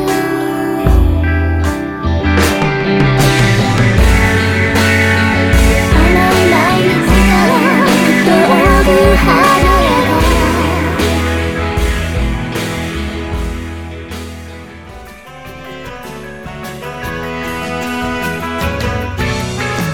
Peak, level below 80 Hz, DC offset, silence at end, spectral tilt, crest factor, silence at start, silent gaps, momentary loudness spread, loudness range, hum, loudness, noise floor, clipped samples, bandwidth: 0 dBFS; -20 dBFS; under 0.1%; 0 s; -5.5 dB/octave; 12 dB; 0 s; none; 18 LU; 15 LU; none; -12 LUFS; -32 dBFS; under 0.1%; 18 kHz